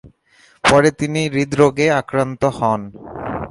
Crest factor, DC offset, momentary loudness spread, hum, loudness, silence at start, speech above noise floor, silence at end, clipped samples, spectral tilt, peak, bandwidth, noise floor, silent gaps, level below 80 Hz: 18 dB; under 0.1%; 13 LU; none; -17 LUFS; 0.05 s; 36 dB; 0 s; under 0.1%; -5.5 dB/octave; 0 dBFS; 11.5 kHz; -53 dBFS; none; -44 dBFS